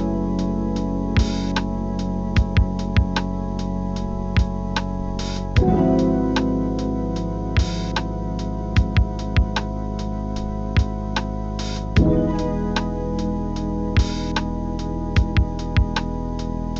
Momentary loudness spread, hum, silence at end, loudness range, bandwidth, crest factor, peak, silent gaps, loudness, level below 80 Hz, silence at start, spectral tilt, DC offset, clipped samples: 8 LU; none; 0 s; 2 LU; 7.8 kHz; 18 dB; -4 dBFS; none; -23 LUFS; -26 dBFS; 0 s; -7 dB/octave; under 0.1%; under 0.1%